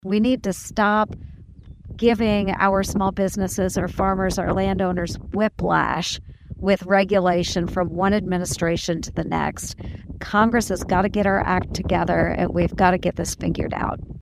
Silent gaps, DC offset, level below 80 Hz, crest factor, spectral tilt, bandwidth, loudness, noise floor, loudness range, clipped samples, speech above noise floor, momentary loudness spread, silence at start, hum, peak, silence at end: none; under 0.1%; -38 dBFS; 18 dB; -5.5 dB/octave; 15.5 kHz; -22 LUFS; -43 dBFS; 2 LU; under 0.1%; 21 dB; 8 LU; 0.05 s; none; -4 dBFS; 0 s